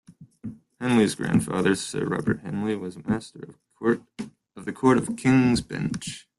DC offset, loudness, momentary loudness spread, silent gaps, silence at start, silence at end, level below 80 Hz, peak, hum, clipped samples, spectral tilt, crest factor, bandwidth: under 0.1%; -25 LUFS; 19 LU; none; 0.1 s; 0.2 s; -54 dBFS; -6 dBFS; none; under 0.1%; -6 dB/octave; 20 dB; 12.5 kHz